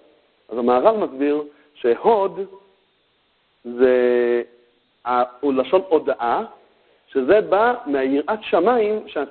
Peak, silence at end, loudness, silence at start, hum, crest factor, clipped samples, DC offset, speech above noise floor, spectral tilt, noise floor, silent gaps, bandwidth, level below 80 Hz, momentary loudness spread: 0 dBFS; 0 s; -19 LUFS; 0.5 s; none; 20 dB; under 0.1%; under 0.1%; 45 dB; -10 dB/octave; -64 dBFS; none; 4.5 kHz; -60 dBFS; 16 LU